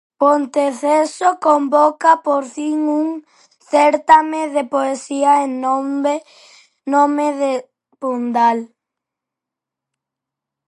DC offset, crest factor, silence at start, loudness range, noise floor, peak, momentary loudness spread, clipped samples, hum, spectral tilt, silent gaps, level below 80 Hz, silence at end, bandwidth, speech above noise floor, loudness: under 0.1%; 16 dB; 0.2 s; 4 LU; -84 dBFS; 0 dBFS; 10 LU; under 0.1%; none; -3.5 dB/octave; none; -68 dBFS; 2 s; 11.5 kHz; 69 dB; -16 LUFS